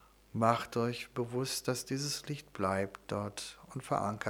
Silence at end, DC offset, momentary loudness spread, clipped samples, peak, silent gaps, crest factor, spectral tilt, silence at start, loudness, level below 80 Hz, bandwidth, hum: 0 s; under 0.1%; 12 LU; under 0.1%; -12 dBFS; none; 24 dB; -4.5 dB/octave; 0.35 s; -35 LUFS; -66 dBFS; over 20 kHz; none